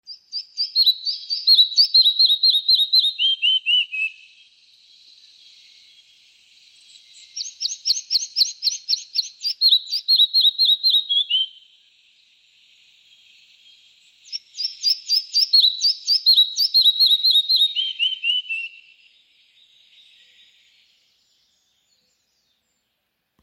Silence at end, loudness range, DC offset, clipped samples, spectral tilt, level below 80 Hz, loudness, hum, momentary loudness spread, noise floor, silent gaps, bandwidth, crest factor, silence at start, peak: 4.75 s; 14 LU; under 0.1%; under 0.1%; 7.5 dB/octave; -90 dBFS; -16 LUFS; none; 14 LU; -74 dBFS; none; 16.5 kHz; 18 dB; 0.1 s; -4 dBFS